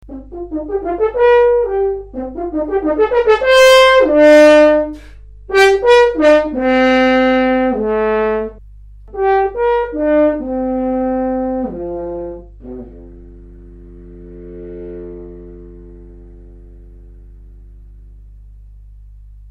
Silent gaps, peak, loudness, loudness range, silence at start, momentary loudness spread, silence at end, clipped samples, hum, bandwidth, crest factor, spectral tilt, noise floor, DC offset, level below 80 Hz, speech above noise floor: none; 0 dBFS; -12 LUFS; 24 LU; 0.05 s; 23 LU; 0.15 s; under 0.1%; 50 Hz at -40 dBFS; 15.5 kHz; 14 dB; -4 dB/octave; -37 dBFS; under 0.1%; -38 dBFS; 24 dB